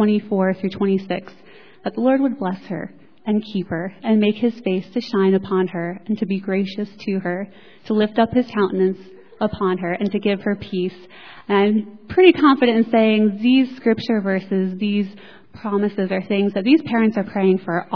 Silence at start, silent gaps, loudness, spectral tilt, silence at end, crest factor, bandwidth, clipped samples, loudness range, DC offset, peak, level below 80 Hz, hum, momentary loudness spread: 0 s; none; -20 LUFS; -8.5 dB/octave; 0 s; 20 dB; 5.4 kHz; under 0.1%; 6 LU; 0.4%; 0 dBFS; -58 dBFS; none; 12 LU